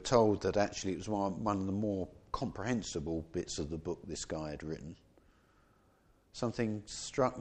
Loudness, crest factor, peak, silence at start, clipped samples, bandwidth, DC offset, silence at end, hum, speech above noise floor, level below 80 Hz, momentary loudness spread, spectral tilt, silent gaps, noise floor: -36 LUFS; 24 dB; -12 dBFS; 0 s; under 0.1%; 9.6 kHz; under 0.1%; 0 s; none; 33 dB; -56 dBFS; 9 LU; -5.5 dB/octave; none; -68 dBFS